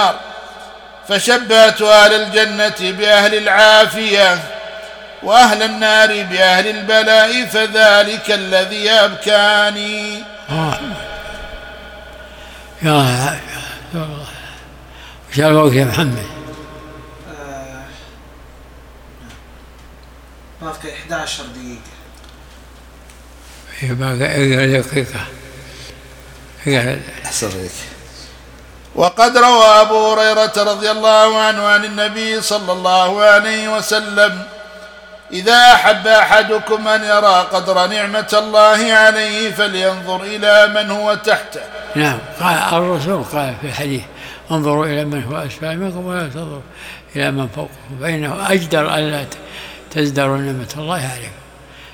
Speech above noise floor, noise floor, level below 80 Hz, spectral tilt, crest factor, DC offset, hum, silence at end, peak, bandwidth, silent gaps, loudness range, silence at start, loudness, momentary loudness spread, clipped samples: 26 dB; -39 dBFS; -44 dBFS; -3.5 dB/octave; 14 dB; under 0.1%; none; 0.05 s; 0 dBFS; 19 kHz; none; 12 LU; 0 s; -12 LUFS; 22 LU; 0.2%